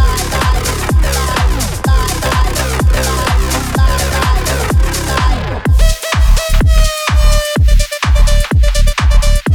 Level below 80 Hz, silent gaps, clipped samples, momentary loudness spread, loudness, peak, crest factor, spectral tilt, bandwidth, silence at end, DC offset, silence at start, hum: -12 dBFS; none; under 0.1%; 2 LU; -13 LUFS; 0 dBFS; 10 dB; -4.5 dB/octave; 18.5 kHz; 0 s; under 0.1%; 0 s; none